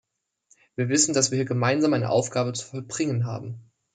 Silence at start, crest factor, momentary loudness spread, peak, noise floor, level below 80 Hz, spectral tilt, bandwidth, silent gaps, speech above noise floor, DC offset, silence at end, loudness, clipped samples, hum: 0.8 s; 20 dB; 15 LU; -6 dBFS; -65 dBFS; -66 dBFS; -4.5 dB/octave; 9.6 kHz; none; 40 dB; under 0.1%; 0.35 s; -24 LUFS; under 0.1%; none